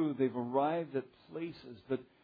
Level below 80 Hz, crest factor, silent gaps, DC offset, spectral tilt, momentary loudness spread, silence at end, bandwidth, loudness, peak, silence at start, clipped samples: -78 dBFS; 18 dB; none; under 0.1%; -6.5 dB/octave; 12 LU; 0.2 s; 5 kHz; -36 LUFS; -18 dBFS; 0 s; under 0.1%